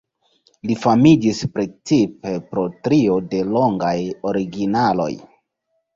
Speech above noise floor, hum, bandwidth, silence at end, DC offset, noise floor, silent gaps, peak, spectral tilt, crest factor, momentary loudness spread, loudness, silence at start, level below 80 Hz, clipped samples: 54 dB; none; 7.6 kHz; 0.75 s; under 0.1%; -72 dBFS; none; -2 dBFS; -7 dB/octave; 18 dB; 12 LU; -19 LUFS; 0.65 s; -52 dBFS; under 0.1%